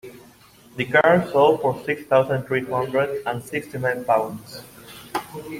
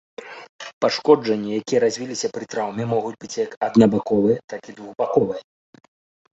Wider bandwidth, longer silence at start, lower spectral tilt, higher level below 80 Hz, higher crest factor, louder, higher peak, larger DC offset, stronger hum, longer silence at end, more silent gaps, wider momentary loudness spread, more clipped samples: first, 16.5 kHz vs 8 kHz; second, 0.05 s vs 0.2 s; about the same, -6 dB/octave vs -5.5 dB/octave; about the same, -60 dBFS vs -60 dBFS; about the same, 20 dB vs 20 dB; about the same, -21 LUFS vs -21 LUFS; about the same, -4 dBFS vs -2 dBFS; neither; neither; second, 0 s vs 1 s; second, none vs 0.49-0.59 s, 0.73-0.81 s, 3.57-3.61 s, 4.44-4.48 s; about the same, 20 LU vs 19 LU; neither